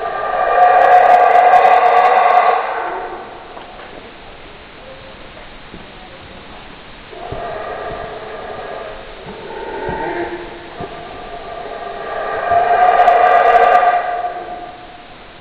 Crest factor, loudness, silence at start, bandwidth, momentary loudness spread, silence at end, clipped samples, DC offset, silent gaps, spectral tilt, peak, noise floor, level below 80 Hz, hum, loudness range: 16 dB; -12 LUFS; 0 s; 6 kHz; 26 LU; 0 s; under 0.1%; under 0.1%; none; -5.5 dB/octave; 0 dBFS; -36 dBFS; -42 dBFS; none; 22 LU